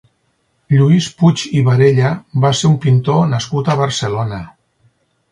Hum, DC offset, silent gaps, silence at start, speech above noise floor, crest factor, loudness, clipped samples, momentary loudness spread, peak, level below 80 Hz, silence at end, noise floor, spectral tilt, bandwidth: none; under 0.1%; none; 0.7 s; 50 dB; 14 dB; -14 LUFS; under 0.1%; 7 LU; 0 dBFS; -48 dBFS; 0.85 s; -63 dBFS; -6.5 dB/octave; 11 kHz